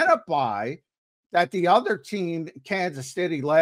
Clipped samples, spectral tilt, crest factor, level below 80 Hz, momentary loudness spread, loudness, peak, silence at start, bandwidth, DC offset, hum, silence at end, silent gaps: under 0.1%; -5.5 dB/octave; 18 dB; -74 dBFS; 10 LU; -25 LUFS; -6 dBFS; 0 s; 15 kHz; under 0.1%; none; 0 s; 0.98-1.30 s